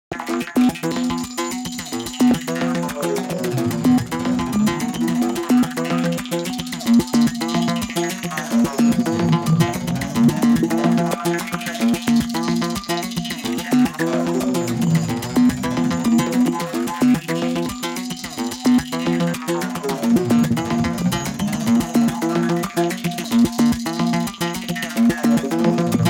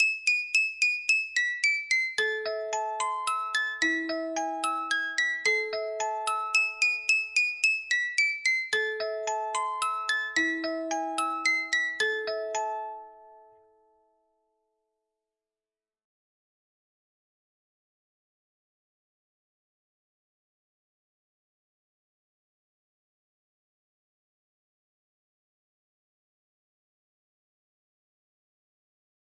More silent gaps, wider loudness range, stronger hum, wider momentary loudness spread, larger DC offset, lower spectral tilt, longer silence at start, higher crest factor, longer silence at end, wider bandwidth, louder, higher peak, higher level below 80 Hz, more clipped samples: neither; second, 2 LU vs 6 LU; neither; about the same, 7 LU vs 8 LU; neither; first, -5.5 dB/octave vs 0.5 dB/octave; about the same, 0.1 s vs 0 s; about the same, 16 dB vs 20 dB; second, 0 s vs 15.95 s; first, 17 kHz vs 11.5 kHz; first, -20 LUFS vs -27 LUFS; first, -4 dBFS vs -12 dBFS; first, -46 dBFS vs -80 dBFS; neither